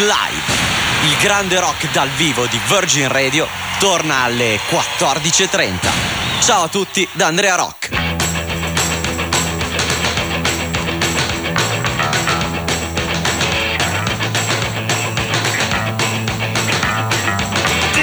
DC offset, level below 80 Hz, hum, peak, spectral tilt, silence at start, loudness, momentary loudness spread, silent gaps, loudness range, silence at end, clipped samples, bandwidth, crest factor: under 0.1%; -36 dBFS; none; 0 dBFS; -2.5 dB/octave; 0 s; -15 LUFS; 5 LU; none; 3 LU; 0 s; under 0.1%; over 20 kHz; 16 dB